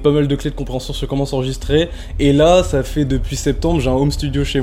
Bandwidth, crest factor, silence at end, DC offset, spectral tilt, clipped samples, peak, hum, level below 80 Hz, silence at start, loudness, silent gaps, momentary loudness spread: 16 kHz; 14 dB; 0 s; under 0.1%; -6 dB/octave; under 0.1%; 0 dBFS; none; -26 dBFS; 0 s; -17 LUFS; none; 11 LU